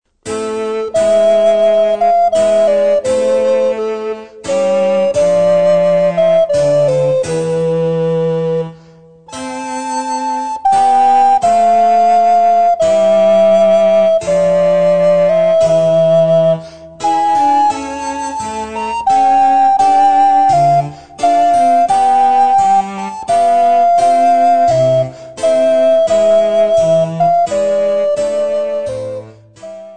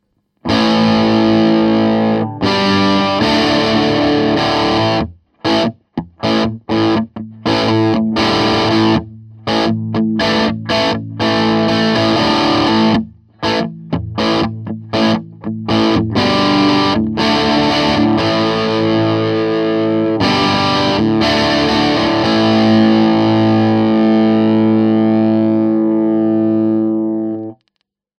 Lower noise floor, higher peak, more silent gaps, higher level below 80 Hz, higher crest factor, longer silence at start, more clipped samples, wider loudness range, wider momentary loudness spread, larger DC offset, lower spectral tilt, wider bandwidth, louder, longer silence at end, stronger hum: second, -41 dBFS vs -69 dBFS; about the same, -2 dBFS vs -2 dBFS; neither; second, -50 dBFS vs -42 dBFS; about the same, 10 dB vs 12 dB; second, 0.25 s vs 0.45 s; neither; about the same, 4 LU vs 4 LU; first, 11 LU vs 7 LU; first, 1% vs under 0.1%; about the same, -5.5 dB/octave vs -6 dB/octave; about the same, 9.4 kHz vs 9 kHz; about the same, -12 LUFS vs -14 LUFS; second, 0 s vs 0.65 s; neither